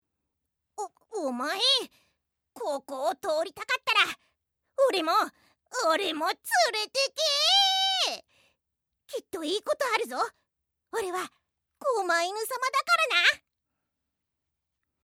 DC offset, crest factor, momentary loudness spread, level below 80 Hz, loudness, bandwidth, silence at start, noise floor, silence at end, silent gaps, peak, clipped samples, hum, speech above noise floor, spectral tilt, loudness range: under 0.1%; 22 dB; 15 LU; -80 dBFS; -26 LUFS; 17.5 kHz; 0.8 s; -82 dBFS; 1.65 s; none; -8 dBFS; under 0.1%; none; 55 dB; 0.5 dB/octave; 7 LU